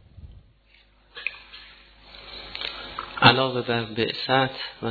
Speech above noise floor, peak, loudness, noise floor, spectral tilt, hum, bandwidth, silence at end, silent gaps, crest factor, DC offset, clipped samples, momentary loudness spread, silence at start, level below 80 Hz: 33 dB; -2 dBFS; -23 LUFS; -58 dBFS; -7 dB/octave; none; 4.8 kHz; 0 s; none; 26 dB; under 0.1%; under 0.1%; 26 LU; 0.2 s; -54 dBFS